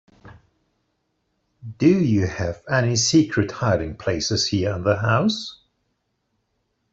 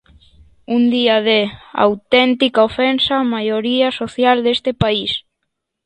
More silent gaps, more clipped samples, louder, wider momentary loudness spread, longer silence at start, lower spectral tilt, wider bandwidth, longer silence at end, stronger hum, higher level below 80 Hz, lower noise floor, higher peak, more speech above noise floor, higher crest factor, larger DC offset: neither; neither; second, -21 LUFS vs -16 LUFS; first, 9 LU vs 5 LU; second, 0.25 s vs 0.7 s; about the same, -5 dB/octave vs -6 dB/octave; second, 8 kHz vs 9.6 kHz; first, 1.4 s vs 0.65 s; neither; about the same, -50 dBFS vs -48 dBFS; about the same, -73 dBFS vs -75 dBFS; second, -4 dBFS vs 0 dBFS; second, 52 dB vs 59 dB; about the same, 18 dB vs 16 dB; neither